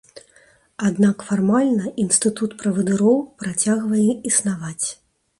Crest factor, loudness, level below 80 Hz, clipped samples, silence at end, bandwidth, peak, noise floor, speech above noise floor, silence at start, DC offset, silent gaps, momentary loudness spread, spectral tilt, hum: 16 dB; -20 LUFS; -60 dBFS; under 0.1%; 0.45 s; 11.5 kHz; -4 dBFS; -55 dBFS; 35 dB; 0.15 s; under 0.1%; none; 8 LU; -5 dB/octave; none